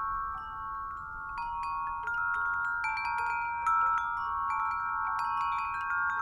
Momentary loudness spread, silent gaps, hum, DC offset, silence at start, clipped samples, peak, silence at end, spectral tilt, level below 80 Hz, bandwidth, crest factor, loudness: 9 LU; none; none; under 0.1%; 0 s; under 0.1%; -18 dBFS; 0 s; -3 dB/octave; -56 dBFS; 12 kHz; 14 dB; -32 LUFS